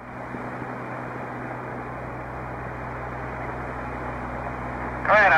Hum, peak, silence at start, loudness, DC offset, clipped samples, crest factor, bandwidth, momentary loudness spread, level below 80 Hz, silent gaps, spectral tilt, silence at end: none; -8 dBFS; 0 s; -30 LUFS; under 0.1%; under 0.1%; 18 dB; 11.5 kHz; 4 LU; -44 dBFS; none; -6.5 dB/octave; 0 s